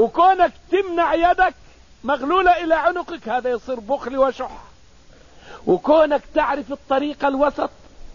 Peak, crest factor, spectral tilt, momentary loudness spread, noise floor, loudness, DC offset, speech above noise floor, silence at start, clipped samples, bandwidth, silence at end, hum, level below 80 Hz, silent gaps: -4 dBFS; 16 dB; -5.5 dB/octave; 12 LU; -49 dBFS; -19 LUFS; 0.3%; 30 dB; 0 s; under 0.1%; 7.4 kHz; 0 s; none; -44 dBFS; none